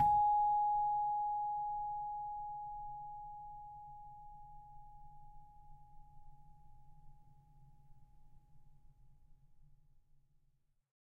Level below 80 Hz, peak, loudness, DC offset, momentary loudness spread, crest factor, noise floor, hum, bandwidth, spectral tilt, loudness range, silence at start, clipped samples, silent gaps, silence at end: -62 dBFS; -22 dBFS; -37 LUFS; under 0.1%; 26 LU; 18 dB; -75 dBFS; none; 3.7 kHz; -4 dB/octave; 26 LU; 0 s; under 0.1%; none; 1.25 s